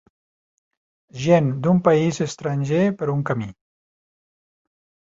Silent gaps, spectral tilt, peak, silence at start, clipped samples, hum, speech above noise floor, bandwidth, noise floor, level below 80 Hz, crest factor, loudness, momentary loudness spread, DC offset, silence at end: none; -7 dB/octave; -2 dBFS; 1.15 s; under 0.1%; none; over 70 dB; 7.8 kHz; under -90 dBFS; -58 dBFS; 20 dB; -20 LUFS; 10 LU; under 0.1%; 1.55 s